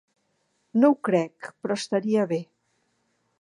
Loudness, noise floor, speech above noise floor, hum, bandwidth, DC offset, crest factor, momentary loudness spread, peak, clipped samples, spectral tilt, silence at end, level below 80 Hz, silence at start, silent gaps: -25 LUFS; -72 dBFS; 48 dB; none; 11 kHz; under 0.1%; 20 dB; 11 LU; -8 dBFS; under 0.1%; -6 dB/octave; 0.95 s; -78 dBFS; 0.75 s; none